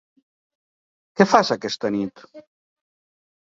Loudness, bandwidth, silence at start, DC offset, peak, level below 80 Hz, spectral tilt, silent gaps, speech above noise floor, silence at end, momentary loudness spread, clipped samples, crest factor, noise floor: -20 LUFS; 7.8 kHz; 1.15 s; under 0.1%; -2 dBFS; -64 dBFS; -5 dB/octave; none; over 70 dB; 1.05 s; 14 LU; under 0.1%; 22 dB; under -90 dBFS